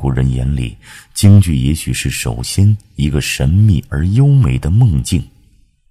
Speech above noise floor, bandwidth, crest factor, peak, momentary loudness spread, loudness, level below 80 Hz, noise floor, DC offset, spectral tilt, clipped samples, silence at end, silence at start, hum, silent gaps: 38 dB; 14.5 kHz; 12 dB; 0 dBFS; 9 LU; -13 LUFS; -24 dBFS; -50 dBFS; under 0.1%; -6 dB/octave; 0.2%; 0.65 s; 0 s; none; none